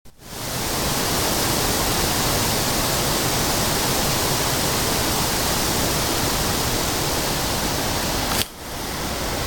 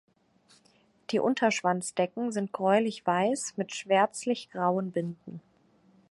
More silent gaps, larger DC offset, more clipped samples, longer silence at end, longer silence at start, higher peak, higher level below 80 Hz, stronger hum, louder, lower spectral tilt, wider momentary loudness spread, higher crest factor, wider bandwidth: neither; neither; neither; second, 0 s vs 0.7 s; second, 0.05 s vs 1.1 s; first, 0 dBFS vs -10 dBFS; first, -34 dBFS vs -78 dBFS; neither; first, -20 LUFS vs -29 LUFS; second, -2.5 dB/octave vs -4.5 dB/octave; second, 6 LU vs 11 LU; about the same, 22 dB vs 20 dB; first, 17.5 kHz vs 11.5 kHz